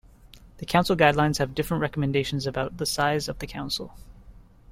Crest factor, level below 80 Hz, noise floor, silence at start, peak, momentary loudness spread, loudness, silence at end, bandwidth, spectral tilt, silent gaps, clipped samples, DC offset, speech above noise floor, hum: 20 dB; -46 dBFS; -50 dBFS; 0.35 s; -6 dBFS; 12 LU; -25 LUFS; 0 s; 16.5 kHz; -5 dB/octave; none; under 0.1%; under 0.1%; 25 dB; none